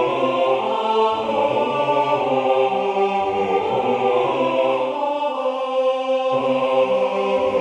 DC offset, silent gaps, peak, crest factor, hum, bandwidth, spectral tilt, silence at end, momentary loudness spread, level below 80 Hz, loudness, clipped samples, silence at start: under 0.1%; none; -4 dBFS; 14 dB; none; 8.8 kHz; -5.5 dB/octave; 0 s; 3 LU; -60 dBFS; -20 LUFS; under 0.1%; 0 s